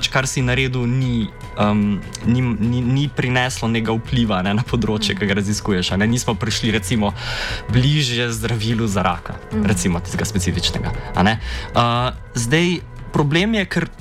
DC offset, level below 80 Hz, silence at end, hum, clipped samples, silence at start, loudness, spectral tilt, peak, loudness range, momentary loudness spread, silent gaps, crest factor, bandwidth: under 0.1%; -34 dBFS; 0 s; none; under 0.1%; 0 s; -19 LUFS; -5 dB/octave; -4 dBFS; 1 LU; 6 LU; none; 14 dB; 15 kHz